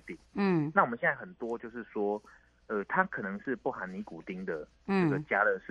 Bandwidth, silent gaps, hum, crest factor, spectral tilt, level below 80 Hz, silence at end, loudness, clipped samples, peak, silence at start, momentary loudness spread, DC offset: 8.2 kHz; none; none; 24 dB; -8.5 dB/octave; -66 dBFS; 0 s; -32 LUFS; under 0.1%; -10 dBFS; 0.05 s; 12 LU; under 0.1%